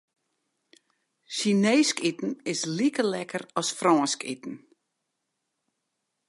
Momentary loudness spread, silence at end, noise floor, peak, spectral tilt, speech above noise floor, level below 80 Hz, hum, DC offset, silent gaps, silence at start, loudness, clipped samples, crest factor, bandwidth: 13 LU; 1.7 s; -81 dBFS; -8 dBFS; -4 dB/octave; 55 dB; -80 dBFS; none; under 0.1%; none; 1.3 s; -26 LUFS; under 0.1%; 20 dB; 11.5 kHz